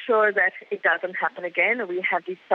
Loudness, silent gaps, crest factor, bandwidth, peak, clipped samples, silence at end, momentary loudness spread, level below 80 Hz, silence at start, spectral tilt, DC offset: -23 LUFS; none; 16 dB; 5.6 kHz; -8 dBFS; under 0.1%; 0 s; 7 LU; -78 dBFS; 0 s; -6 dB/octave; under 0.1%